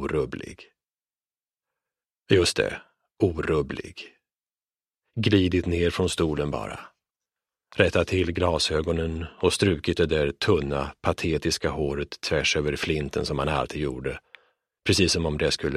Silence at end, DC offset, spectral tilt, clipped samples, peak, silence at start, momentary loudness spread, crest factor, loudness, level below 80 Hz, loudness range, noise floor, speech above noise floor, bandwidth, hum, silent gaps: 0 s; under 0.1%; -5 dB/octave; under 0.1%; -2 dBFS; 0 s; 12 LU; 24 dB; -25 LUFS; -42 dBFS; 3 LU; under -90 dBFS; over 65 dB; 14.5 kHz; none; none